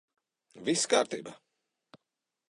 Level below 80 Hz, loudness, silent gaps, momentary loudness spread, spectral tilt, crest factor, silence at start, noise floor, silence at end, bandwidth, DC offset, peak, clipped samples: -84 dBFS; -30 LUFS; none; 15 LU; -2.5 dB/octave; 24 dB; 0.55 s; -87 dBFS; 1.15 s; 11.5 kHz; under 0.1%; -12 dBFS; under 0.1%